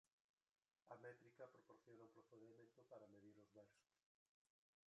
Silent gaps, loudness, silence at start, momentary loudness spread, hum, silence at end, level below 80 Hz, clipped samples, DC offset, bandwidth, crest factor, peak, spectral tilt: 0.12-0.37 s, 0.51-0.55 s; -66 LUFS; 0.05 s; 7 LU; none; 1.1 s; under -90 dBFS; under 0.1%; under 0.1%; 7.4 kHz; 22 dB; -48 dBFS; -6 dB/octave